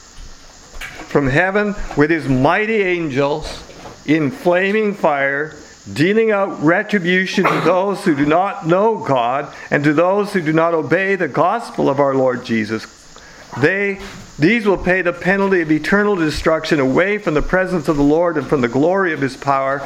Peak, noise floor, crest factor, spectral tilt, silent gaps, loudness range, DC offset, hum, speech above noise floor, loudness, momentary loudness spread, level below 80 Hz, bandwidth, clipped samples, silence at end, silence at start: 0 dBFS; -40 dBFS; 16 dB; -6.5 dB/octave; none; 2 LU; under 0.1%; none; 24 dB; -16 LUFS; 7 LU; -38 dBFS; 15 kHz; under 0.1%; 0 s; 0.15 s